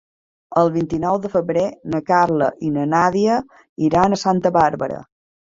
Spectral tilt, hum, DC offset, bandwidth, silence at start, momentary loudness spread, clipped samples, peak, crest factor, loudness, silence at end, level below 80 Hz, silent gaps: -6.5 dB/octave; none; under 0.1%; 7.8 kHz; 0.5 s; 8 LU; under 0.1%; -2 dBFS; 18 dB; -18 LUFS; 0.55 s; -50 dBFS; 3.69-3.76 s